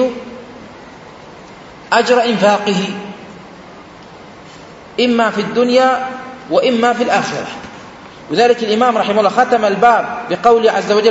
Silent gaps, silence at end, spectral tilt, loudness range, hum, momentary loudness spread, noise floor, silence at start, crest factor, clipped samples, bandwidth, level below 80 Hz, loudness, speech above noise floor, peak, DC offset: none; 0 s; -4.5 dB/octave; 4 LU; none; 23 LU; -36 dBFS; 0 s; 16 dB; under 0.1%; 8 kHz; -54 dBFS; -13 LUFS; 23 dB; 0 dBFS; under 0.1%